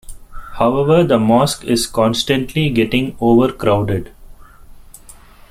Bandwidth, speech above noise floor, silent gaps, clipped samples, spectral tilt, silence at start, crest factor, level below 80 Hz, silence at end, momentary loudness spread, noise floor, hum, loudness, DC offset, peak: 16 kHz; 26 dB; none; under 0.1%; -5.5 dB/octave; 0.1 s; 16 dB; -38 dBFS; 0.75 s; 5 LU; -41 dBFS; none; -15 LUFS; under 0.1%; 0 dBFS